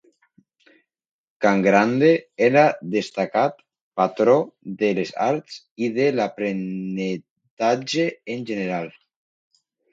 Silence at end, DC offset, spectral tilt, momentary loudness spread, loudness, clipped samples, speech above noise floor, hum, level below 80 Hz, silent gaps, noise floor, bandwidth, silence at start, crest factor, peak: 1 s; under 0.1%; -6 dB/octave; 12 LU; -21 LUFS; under 0.1%; 41 dB; none; -68 dBFS; 3.81-3.91 s, 5.71-5.76 s, 7.30-7.36 s, 7.51-7.57 s; -61 dBFS; 7.8 kHz; 1.4 s; 20 dB; -2 dBFS